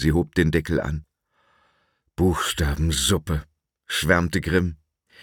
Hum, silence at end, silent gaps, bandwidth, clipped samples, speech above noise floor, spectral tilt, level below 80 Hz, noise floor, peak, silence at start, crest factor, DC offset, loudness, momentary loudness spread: none; 0.45 s; none; 18.5 kHz; under 0.1%; 46 dB; -4.5 dB/octave; -34 dBFS; -68 dBFS; -4 dBFS; 0 s; 20 dB; under 0.1%; -23 LUFS; 10 LU